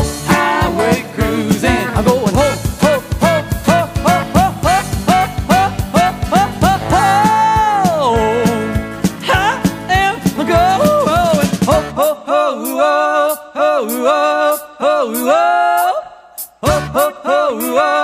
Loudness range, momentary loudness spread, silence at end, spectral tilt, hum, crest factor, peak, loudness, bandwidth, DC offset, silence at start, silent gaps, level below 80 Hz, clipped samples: 2 LU; 5 LU; 0 s; -5 dB/octave; none; 14 dB; 0 dBFS; -14 LUFS; 15.5 kHz; under 0.1%; 0 s; none; -30 dBFS; under 0.1%